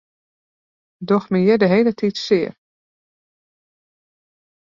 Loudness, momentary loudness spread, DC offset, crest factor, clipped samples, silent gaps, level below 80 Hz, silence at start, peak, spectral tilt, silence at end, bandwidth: -18 LUFS; 10 LU; under 0.1%; 18 dB; under 0.1%; none; -62 dBFS; 1 s; -4 dBFS; -7 dB/octave; 2.15 s; 7.4 kHz